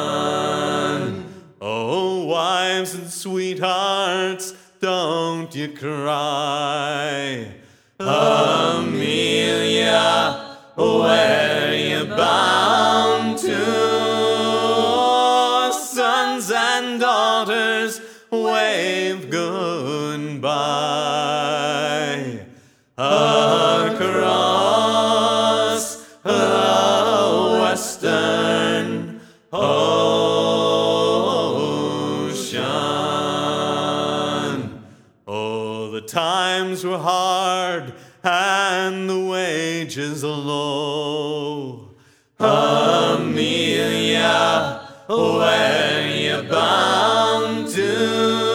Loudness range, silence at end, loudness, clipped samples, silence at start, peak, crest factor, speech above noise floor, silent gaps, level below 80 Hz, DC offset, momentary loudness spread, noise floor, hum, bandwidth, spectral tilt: 6 LU; 0 s; -19 LUFS; under 0.1%; 0 s; -2 dBFS; 18 dB; 32 dB; none; -68 dBFS; under 0.1%; 11 LU; -52 dBFS; none; 18 kHz; -3.5 dB/octave